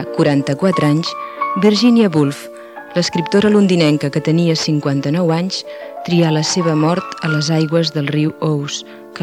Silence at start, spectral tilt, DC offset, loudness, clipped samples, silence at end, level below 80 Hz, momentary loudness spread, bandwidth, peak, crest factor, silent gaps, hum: 0 s; -6 dB/octave; under 0.1%; -15 LUFS; under 0.1%; 0 s; -58 dBFS; 11 LU; 13 kHz; 0 dBFS; 14 dB; none; none